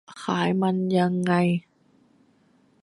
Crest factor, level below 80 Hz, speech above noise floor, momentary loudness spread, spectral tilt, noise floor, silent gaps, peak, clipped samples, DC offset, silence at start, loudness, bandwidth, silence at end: 16 dB; -66 dBFS; 39 dB; 5 LU; -7 dB/octave; -62 dBFS; none; -8 dBFS; under 0.1%; under 0.1%; 0.1 s; -24 LUFS; 11 kHz; 1.25 s